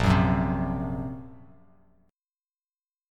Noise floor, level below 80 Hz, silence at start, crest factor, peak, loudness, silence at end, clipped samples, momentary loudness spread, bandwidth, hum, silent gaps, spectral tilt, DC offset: under -90 dBFS; -40 dBFS; 0 s; 20 dB; -10 dBFS; -27 LUFS; 1.7 s; under 0.1%; 19 LU; 11 kHz; none; none; -7.5 dB/octave; under 0.1%